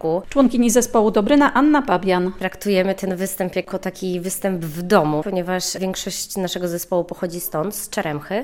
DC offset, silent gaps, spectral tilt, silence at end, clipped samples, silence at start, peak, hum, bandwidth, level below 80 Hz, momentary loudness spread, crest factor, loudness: under 0.1%; none; -4.5 dB/octave; 0 s; under 0.1%; 0 s; 0 dBFS; none; 17.5 kHz; -46 dBFS; 10 LU; 18 dB; -20 LUFS